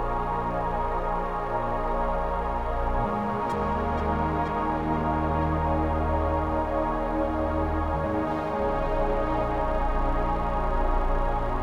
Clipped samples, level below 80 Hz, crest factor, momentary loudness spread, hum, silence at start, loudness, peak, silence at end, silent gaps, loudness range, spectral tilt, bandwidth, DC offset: under 0.1%; -30 dBFS; 12 dB; 2 LU; none; 0 s; -27 LUFS; -14 dBFS; 0 s; none; 2 LU; -8.5 dB/octave; 6.8 kHz; under 0.1%